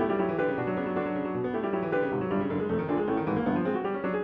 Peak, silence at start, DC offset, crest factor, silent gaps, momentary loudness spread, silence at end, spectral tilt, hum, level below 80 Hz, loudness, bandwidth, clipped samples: -16 dBFS; 0 s; under 0.1%; 12 dB; none; 3 LU; 0 s; -10 dB/octave; none; -58 dBFS; -29 LUFS; 5.2 kHz; under 0.1%